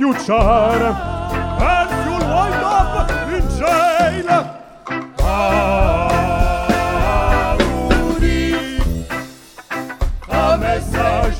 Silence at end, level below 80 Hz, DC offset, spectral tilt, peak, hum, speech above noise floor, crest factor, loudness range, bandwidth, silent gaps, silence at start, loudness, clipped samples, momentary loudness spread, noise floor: 0 s; -22 dBFS; under 0.1%; -6 dB/octave; 0 dBFS; none; 21 dB; 16 dB; 3 LU; 17.5 kHz; none; 0 s; -17 LUFS; under 0.1%; 11 LU; -36 dBFS